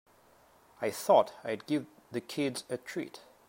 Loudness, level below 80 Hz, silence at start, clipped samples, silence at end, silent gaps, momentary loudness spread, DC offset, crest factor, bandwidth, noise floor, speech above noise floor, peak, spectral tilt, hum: -32 LUFS; -80 dBFS; 0.8 s; under 0.1%; 0.3 s; none; 15 LU; under 0.1%; 22 dB; 16 kHz; -63 dBFS; 31 dB; -10 dBFS; -4.5 dB/octave; none